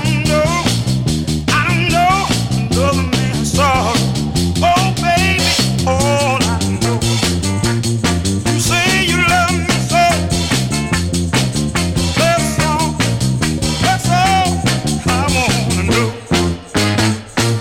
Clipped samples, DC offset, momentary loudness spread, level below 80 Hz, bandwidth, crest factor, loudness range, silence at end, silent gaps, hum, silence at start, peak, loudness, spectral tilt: under 0.1%; under 0.1%; 4 LU; -30 dBFS; 17 kHz; 12 dB; 1 LU; 0 s; none; none; 0 s; -2 dBFS; -14 LUFS; -4.5 dB/octave